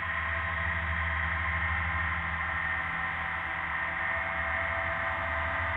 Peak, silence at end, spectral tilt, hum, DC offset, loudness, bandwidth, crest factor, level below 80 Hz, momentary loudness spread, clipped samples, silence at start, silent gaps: -18 dBFS; 0 s; -6.5 dB/octave; none; under 0.1%; -30 LUFS; 4.8 kHz; 12 dB; -42 dBFS; 2 LU; under 0.1%; 0 s; none